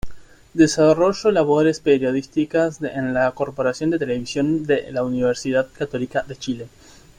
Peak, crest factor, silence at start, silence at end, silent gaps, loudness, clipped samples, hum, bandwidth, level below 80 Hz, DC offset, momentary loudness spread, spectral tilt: -4 dBFS; 18 dB; 0.05 s; 0.5 s; none; -20 LUFS; under 0.1%; none; 11 kHz; -48 dBFS; under 0.1%; 10 LU; -5.5 dB/octave